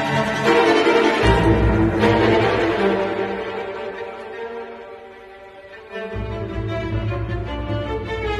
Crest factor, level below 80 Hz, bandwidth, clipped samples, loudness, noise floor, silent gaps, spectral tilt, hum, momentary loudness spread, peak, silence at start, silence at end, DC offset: 18 dB; -32 dBFS; 12.5 kHz; under 0.1%; -19 LUFS; -40 dBFS; none; -6.5 dB/octave; none; 21 LU; -2 dBFS; 0 s; 0 s; under 0.1%